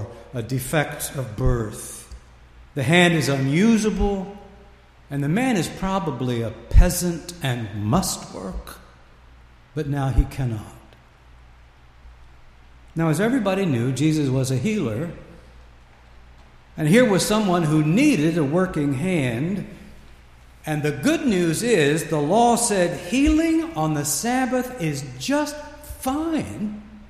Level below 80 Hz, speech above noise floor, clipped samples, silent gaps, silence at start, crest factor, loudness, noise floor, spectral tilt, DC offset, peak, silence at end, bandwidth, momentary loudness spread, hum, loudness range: -32 dBFS; 28 dB; under 0.1%; none; 0 s; 20 dB; -22 LUFS; -49 dBFS; -5.5 dB/octave; under 0.1%; -2 dBFS; 0.05 s; 15.5 kHz; 15 LU; none; 8 LU